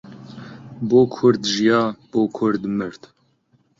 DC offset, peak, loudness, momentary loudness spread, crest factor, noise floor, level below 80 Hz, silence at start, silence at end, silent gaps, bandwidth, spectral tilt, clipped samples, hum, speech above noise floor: under 0.1%; -2 dBFS; -19 LUFS; 22 LU; 18 dB; -62 dBFS; -60 dBFS; 0.05 s; 0.85 s; none; 7.6 kHz; -5.5 dB/octave; under 0.1%; none; 43 dB